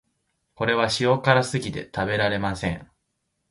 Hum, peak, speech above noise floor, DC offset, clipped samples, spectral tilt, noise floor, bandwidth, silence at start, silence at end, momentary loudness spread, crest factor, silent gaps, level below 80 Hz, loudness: none; -2 dBFS; 53 dB; under 0.1%; under 0.1%; -5 dB/octave; -76 dBFS; 11.5 kHz; 0.6 s; 0.65 s; 10 LU; 22 dB; none; -50 dBFS; -23 LUFS